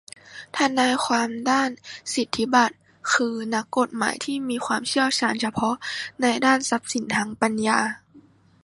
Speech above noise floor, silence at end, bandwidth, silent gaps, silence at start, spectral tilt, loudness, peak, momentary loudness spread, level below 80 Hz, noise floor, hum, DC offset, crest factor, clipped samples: 30 dB; 0.45 s; 11.5 kHz; none; 0.25 s; -2.5 dB/octave; -23 LUFS; -2 dBFS; 9 LU; -64 dBFS; -53 dBFS; none; under 0.1%; 22 dB; under 0.1%